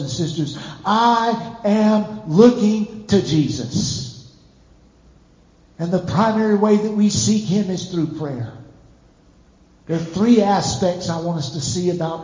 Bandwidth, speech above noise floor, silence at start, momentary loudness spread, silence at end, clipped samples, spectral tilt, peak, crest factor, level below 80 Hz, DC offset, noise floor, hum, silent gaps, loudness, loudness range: 7.6 kHz; 34 dB; 0 s; 11 LU; 0 s; under 0.1%; -5.5 dB/octave; 0 dBFS; 18 dB; -48 dBFS; under 0.1%; -52 dBFS; none; none; -19 LUFS; 6 LU